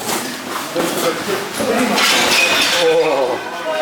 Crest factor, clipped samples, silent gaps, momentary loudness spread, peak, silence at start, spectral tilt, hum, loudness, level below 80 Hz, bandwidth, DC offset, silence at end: 16 dB; under 0.1%; none; 11 LU; -2 dBFS; 0 s; -2 dB/octave; none; -15 LUFS; -56 dBFS; over 20 kHz; under 0.1%; 0 s